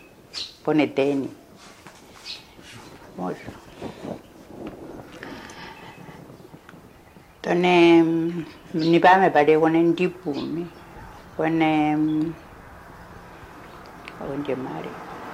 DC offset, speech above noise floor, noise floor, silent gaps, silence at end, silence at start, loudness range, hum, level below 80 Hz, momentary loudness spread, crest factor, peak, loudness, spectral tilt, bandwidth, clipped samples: under 0.1%; 29 dB; -49 dBFS; none; 0 s; 0.35 s; 19 LU; none; -56 dBFS; 27 LU; 20 dB; -4 dBFS; -21 LUFS; -6.5 dB/octave; 11 kHz; under 0.1%